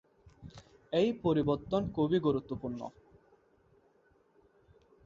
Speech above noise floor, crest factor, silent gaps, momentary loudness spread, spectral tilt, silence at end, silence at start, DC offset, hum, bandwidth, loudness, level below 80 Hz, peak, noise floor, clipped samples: 37 dB; 18 dB; none; 23 LU; -8 dB/octave; 2.15 s; 0.25 s; under 0.1%; none; 7.4 kHz; -32 LUFS; -60 dBFS; -16 dBFS; -68 dBFS; under 0.1%